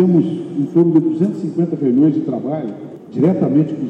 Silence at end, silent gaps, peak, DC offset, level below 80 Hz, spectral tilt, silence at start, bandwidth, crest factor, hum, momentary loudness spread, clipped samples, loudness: 0 s; none; -2 dBFS; under 0.1%; -68 dBFS; -11 dB/octave; 0 s; 5.2 kHz; 14 dB; none; 10 LU; under 0.1%; -16 LUFS